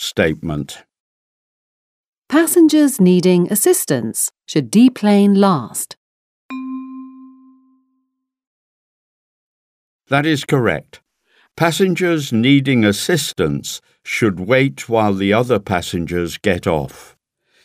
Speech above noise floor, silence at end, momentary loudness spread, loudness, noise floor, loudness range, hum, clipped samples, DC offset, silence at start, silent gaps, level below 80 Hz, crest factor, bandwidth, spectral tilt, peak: 57 dB; 0.6 s; 16 LU; -16 LUFS; -72 dBFS; 11 LU; none; under 0.1%; under 0.1%; 0 s; 1.00-2.22 s, 5.97-6.49 s, 8.47-9.99 s; -48 dBFS; 16 dB; 16 kHz; -5 dB/octave; 0 dBFS